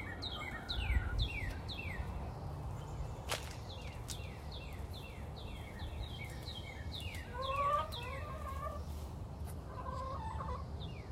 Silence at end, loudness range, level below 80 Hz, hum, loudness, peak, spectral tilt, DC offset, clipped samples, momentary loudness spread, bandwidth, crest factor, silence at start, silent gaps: 0 s; 5 LU; -46 dBFS; none; -42 LUFS; -20 dBFS; -5 dB/octave; under 0.1%; under 0.1%; 10 LU; 16 kHz; 22 dB; 0 s; none